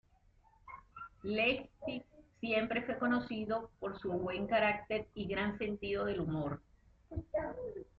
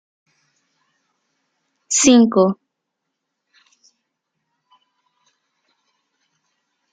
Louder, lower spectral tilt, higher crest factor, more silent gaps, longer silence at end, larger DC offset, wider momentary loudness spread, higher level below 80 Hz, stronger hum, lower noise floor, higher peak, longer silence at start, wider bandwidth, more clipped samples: second, -37 LUFS vs -14 LUFS; about the same, -4 dB/octave vs -3.5 dB/octave; about the same, 18 dB vs 22 dB; neither; second, 0.15 s vs 4.4 s; neither; first, 15 LU vs 10 LU; about the same, -60 dBFS vs -64 dBFS; neither; second, -68 dBFS vs -78 dBFS; second, -20 dBFS vs -2 dBFS; second, 0.65 s vs 1.9 s; second, 5.6 kHz vs 9 kHz; neither